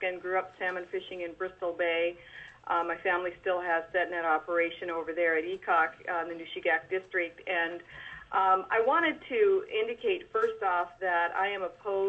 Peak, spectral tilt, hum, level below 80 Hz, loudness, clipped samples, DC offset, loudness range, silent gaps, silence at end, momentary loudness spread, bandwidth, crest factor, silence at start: -14 dBFS; -5.5 dB/octave; none; -68 dBFS; -30 LUFS; under 0.1%; under 0.1%; 4 LU; none; 0 s; 10 LU; 8 kHz; 18 dB; 0 s